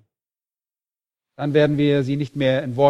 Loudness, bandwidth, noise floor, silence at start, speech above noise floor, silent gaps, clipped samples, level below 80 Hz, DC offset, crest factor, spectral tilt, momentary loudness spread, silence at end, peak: -20 LUFS; 9.4 kHz; under -90 dBFS; 1.4 s; over 72 dB; none; under 0.1%; -58 dBFS; under 0.1%; 18 dB; -8 dB/octave; 6 LU; 0 s; -4 dBFS